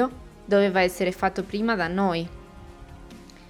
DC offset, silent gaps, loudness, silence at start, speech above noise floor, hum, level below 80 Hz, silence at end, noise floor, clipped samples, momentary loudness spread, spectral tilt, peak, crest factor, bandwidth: under 0.1%; none; -24 LUFS; 0 s; 22 dB; none; -48 dBFS; 0.05 s; -45 dBFS; under 0.1%; 24 LU; -6 dB/octave; -8 dBFS; 18 dB; 17.5 kHz